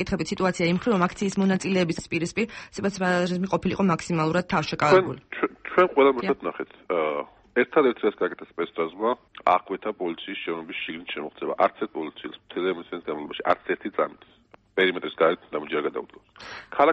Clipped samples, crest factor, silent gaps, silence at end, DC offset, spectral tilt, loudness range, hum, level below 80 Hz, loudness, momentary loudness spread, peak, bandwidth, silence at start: under 0.1%; 18 dB; none; 0 s; under 0.1%; -5.5 dB/octave; 6 LU; none; -56 dBFS; -25 LUFS; 12 LU; -6 dBFS; 8.4 kHz; 0 s